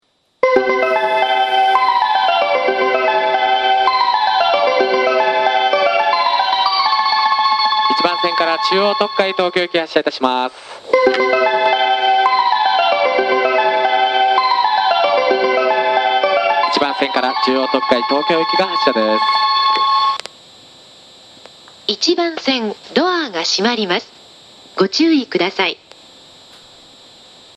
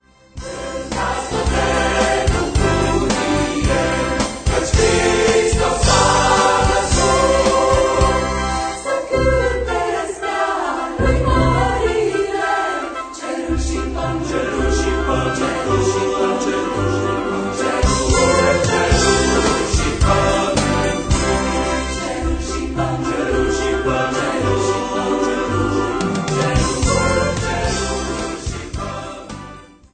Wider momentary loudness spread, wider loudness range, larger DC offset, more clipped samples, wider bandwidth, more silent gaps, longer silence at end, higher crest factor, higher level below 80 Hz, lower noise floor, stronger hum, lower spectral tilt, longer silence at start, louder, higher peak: second, 4 LU vs 8 LU; about the same, 4 LU vs 5 LU; neither; neither; about the same, 10 kHz vs 9.4 kHz; neither; first, 1.8 s vs 0.3 s; about the same, 16 dB vs 16 dB; second, -62 dBFS vs -26 dBFS; first, -43 dBFS vs -38 dBFS; neither; second, -3 dB/octave vs -4.5 dB/octave; about the same, 0.45 s vs 0.35 s; about the same, -15 LUFS vs -17 LUFS; about the same, 0 dBFS vs -2 dBFS